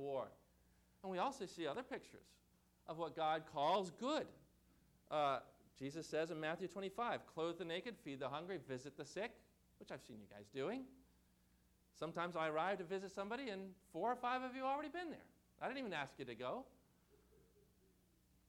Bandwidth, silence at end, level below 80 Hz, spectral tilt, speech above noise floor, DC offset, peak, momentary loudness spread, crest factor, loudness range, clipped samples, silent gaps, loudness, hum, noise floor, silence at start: 19 kHz; 1.8 s; -78 dBFS; -5 dB/octave; 30 dB; under 0.1%; -30 dBFS; 14 LU; 18 dB; 7 LU; under 0.1%; none; -45 LUFS; 60 Hz at -75 dBFS; -75 dBFS; 0 s